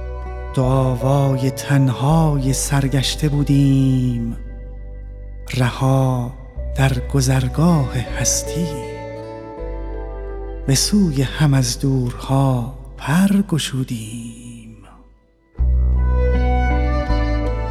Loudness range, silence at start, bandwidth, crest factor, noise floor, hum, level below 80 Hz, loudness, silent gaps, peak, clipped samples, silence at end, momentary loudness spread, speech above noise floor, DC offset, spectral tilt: 5 LU; 0 s; 14.5 kHz; 16 dB; -52 dBFS; none; -26 dBFS; -18 LUFS; none; -2 dBFS; under 0.1%; 0 s; 15 LU; 35 dB; under 0.1%; -5.5 dB/octave